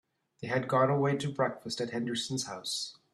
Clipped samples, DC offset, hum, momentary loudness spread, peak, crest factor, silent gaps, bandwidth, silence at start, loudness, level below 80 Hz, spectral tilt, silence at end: under 0.1%; under 0.1%; none; 8 LU; -14 dBFS; 18 dB; none; 13 kHz; 0.4 s; -31 LUFS; -72 dBFS; -4.5 dB/octave; 0.2 s